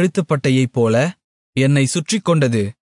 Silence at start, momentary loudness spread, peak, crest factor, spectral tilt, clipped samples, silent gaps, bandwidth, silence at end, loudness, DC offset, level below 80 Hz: 0 s; 4 LU; -4 dBFS; 12 dB; -6 dB/octave; under 0.1%; 1.24-1.53 s; 11 kHz; 0.15 s; -17 LUFS; under 0.1%; -60 dBFS